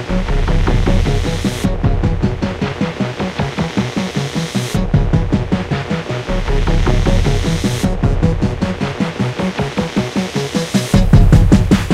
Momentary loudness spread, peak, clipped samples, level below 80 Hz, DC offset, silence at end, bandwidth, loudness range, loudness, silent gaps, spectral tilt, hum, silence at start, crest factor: 8 LU; 0 dBFS; under 0.1%; -18 dBFS; under 0.1%; 0 s; 13.5 kHz; 3 LU; -16 LUFS; none; -6.5 dB/octave; none; 0 s; 14 dB